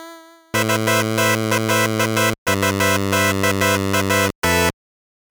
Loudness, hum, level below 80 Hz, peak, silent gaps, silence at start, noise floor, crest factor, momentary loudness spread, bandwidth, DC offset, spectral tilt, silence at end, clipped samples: -18 LUFS; none; -50 dBFS; -4 dBFS; 2.38-2.46 s, 4.35-4.42 s; 0 s; -41 dBFS; 14 dB; 2 LU; over 20 kHz; 0.2%; -4 dB/octave; 0.6 s; under 0.1%